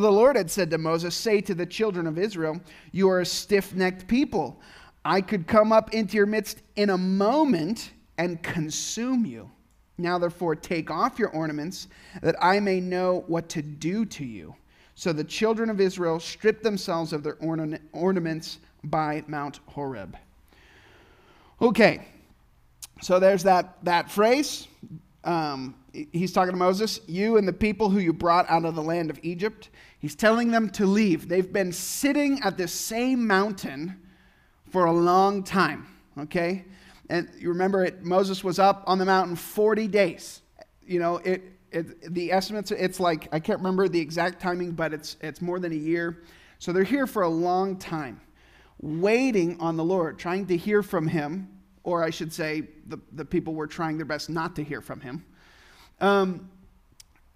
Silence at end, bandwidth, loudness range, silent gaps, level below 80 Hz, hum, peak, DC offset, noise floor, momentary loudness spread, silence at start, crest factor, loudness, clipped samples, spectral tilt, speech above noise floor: 0.85 s; 15.5 kHz; 5 LU; none; -56 dBFS; none; -2 dBFS; under 0.1%; -59 dBFS; 14 LU; 0 s; 24 dB; -25 LUFS; under 0.1%; -5.5 dB/octave; 34 dB